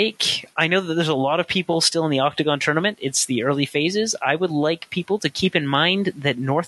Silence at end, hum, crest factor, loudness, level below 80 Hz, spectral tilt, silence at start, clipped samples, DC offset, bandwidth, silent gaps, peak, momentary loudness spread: 0 s; none; 18 dB; -20 LUFS; -60 dBFS; -3.5 dB/octave; 0 s; under 0.1%; under 0.1%; 12.5 kHz; none; -2 dBFS; 4 LU